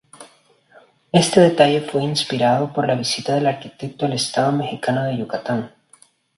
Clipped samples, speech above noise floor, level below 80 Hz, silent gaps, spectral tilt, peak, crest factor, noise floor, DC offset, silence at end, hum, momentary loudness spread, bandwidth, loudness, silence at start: under 0.1%; 36 dB; -60 dBFS; none; -5 dB/octave; 0 dBFS; 20 dB; -54 dBFS; under 0.1%; 0.7 s; none; 11 LU; 11.5 kHz; -19 LUFS; 0.2 s